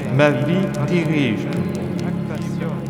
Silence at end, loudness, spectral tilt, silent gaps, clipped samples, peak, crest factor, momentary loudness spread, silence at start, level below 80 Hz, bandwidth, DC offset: 0 s; -20 LUFS; -7.5 dB/octave; none; under 0.1%; -2 dBFS; 18 dB; 8 LU; 0 s; -48 dBFS; 14 kHz; under 0.1%